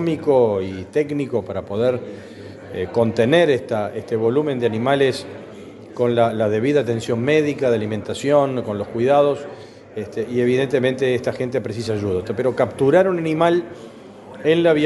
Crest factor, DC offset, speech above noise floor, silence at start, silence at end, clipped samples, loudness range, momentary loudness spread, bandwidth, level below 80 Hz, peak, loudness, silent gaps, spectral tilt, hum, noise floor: 18 dB; under 0.1%; 20 dB; 0 s; 0 s; under 0.1%; 2 LU; 19 LU; 11.5 kHz; -58 dBFS; -2 dBFS; -19 LUFS; none; -6.5 dB/octave; none; -39 dBFS